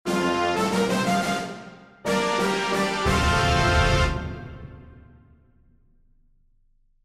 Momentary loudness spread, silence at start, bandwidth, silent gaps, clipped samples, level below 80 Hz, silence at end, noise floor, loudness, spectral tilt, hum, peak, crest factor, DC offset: 19 LU; 0.05 s; 16 kHz; none; under 0.1%; -34 dBFS; 2.05 s; -62 dBFS; -23 LUFS; -4.5 dB/octave; none; -8 dBFS; 16 dB; under 0.1%